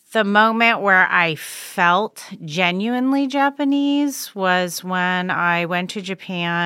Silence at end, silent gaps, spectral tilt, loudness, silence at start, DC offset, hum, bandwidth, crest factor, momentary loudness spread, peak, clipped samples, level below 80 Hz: 0 s; none; -4.5 dB/octave; -18 LUFS; 0.1 s; under 0.1%; none; 16.5 kHz; 18 dB; 13 LU; -2 dBFS; under 0.1%; -74 dBFS